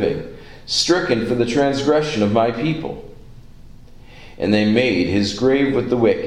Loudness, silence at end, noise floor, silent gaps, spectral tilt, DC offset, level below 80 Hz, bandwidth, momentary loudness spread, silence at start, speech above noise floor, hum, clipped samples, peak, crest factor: -18 LUFS; 0 s; -39 dBFS; none; -5 dB/octave; under 0.1%; -42 dBFS; 11.5 kHz; 11 LU; 0 s; 22 dB; none; under 0.1%; -2 dBFS; 18 dB